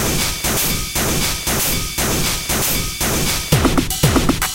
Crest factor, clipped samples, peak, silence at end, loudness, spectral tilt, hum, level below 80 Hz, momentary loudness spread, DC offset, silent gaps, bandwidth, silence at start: 16 dB; under 0.1%; -2 dBFS; 0 s; -17 LUFS; -3 dB/octave; none; -28 dBFS; 3 LU; 0.6%; none; 17 kHz; 0 s